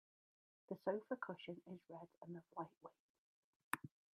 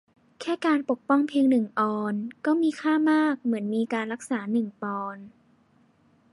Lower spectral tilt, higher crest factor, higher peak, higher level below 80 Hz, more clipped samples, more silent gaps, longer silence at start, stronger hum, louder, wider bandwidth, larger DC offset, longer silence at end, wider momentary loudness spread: about the same, -5.5 dB/octave vs -6 dB/octave; first, 30 dB vs 16 dB; second, -22 dBFS vs -10 dBFS; second, under -90 dBFS vs -78 dBFS; neither; first, 2.17-2.21 s, 2.77-2.81 s, 2.99-3.71 s vs none; first, 0.7 s vs 0.4 s; neither; second, -50 LUFS vs -26 LUFS; about the same, 12 kHz vs 11.5 kHz; neither; second, 0.25 s vs 1.05 s; first, 13 LU vs 10 LU